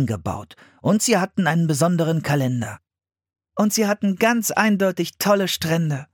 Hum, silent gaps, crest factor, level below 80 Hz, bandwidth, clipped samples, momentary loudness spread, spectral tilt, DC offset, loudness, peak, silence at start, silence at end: none; none; 18 dB; -58 dBFS; 17.5 kHz; under 0.1%; 9 LU; -5 dB/octave; under 0.1%; -20 LUFS; -2 dBFS; 0 s; 0.1 s